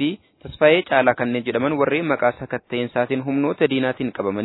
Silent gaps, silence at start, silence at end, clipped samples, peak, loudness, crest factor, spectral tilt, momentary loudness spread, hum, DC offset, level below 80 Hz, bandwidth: none; 0 s; 0 s; under 0.1%; 0 dBFS; -20 LUFS; 20 dB; -9.5 dB/octave; 9 LU; none; under 0.1%; -56 dBFS; 4.1 kHz